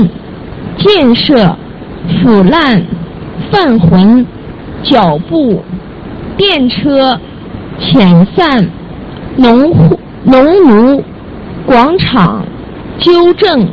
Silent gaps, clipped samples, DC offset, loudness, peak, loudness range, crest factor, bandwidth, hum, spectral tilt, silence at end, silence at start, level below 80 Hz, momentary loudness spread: none; 1%; under 0.1%; -8 LUFS; 0 dBFS; 3 LU; 8 dB; 6.2 kHz; none; -8.5 dB/octave; 0 s; 0 s; -32 dBFS; 19 LU